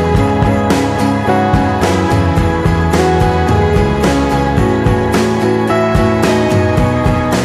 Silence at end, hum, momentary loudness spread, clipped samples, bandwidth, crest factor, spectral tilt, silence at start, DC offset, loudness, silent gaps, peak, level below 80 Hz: 0 s; none; 1 LU; under 0.1%; 15.5 kHz; 12 dB; -6.5 dB/octave; 0 s; under 0.1%; -12 LUFS; none; 0 dBFS; -22 dBFS